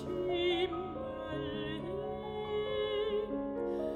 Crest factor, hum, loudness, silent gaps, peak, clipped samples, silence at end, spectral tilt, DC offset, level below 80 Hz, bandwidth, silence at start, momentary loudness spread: 14 dB; none; -36 LUFS; none; -22 dBFS; under 0.1%; 0 s; -7 dB/octave; under 0.1%; -58 dBFS; 9 kHz; 0 s; 8 LU